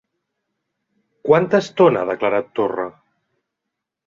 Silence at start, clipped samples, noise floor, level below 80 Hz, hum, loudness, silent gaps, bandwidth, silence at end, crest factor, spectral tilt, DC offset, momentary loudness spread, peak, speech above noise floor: 1.25 s; under 0.1%; -81 dBFS; -62 dBFS; none; -18 LUFS; none; 7.6 kHz; 1.15 s; 18 dB; -6.5 dB/octave; under 0.1%; 13 LU; -2 dBFS; 64 dB